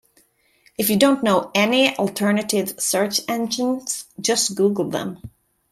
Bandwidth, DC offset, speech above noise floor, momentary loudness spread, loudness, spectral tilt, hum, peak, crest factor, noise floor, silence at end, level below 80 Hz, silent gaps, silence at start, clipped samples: 16 kHz; under 0.1%; 40 dB; 10 LU; -20 LUFS; -3.5 dB/octave; none; -4 dBFS; 18 dB; -60 dBFS; 0.45 s; -60 dBFS; none; 0.8 s; under 0.1%